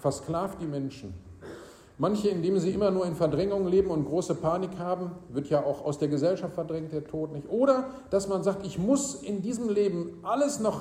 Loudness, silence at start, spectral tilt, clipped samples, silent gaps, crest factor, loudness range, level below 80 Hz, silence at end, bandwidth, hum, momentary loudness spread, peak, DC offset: -29 LUFS; 0 s; -6.5 dB/octave; under 0.1%; none; 18 dB; 3 LU; -56 dBFS; 0 s; 15 kHz; none; 10 LU; -10 dBFS; under 0.1%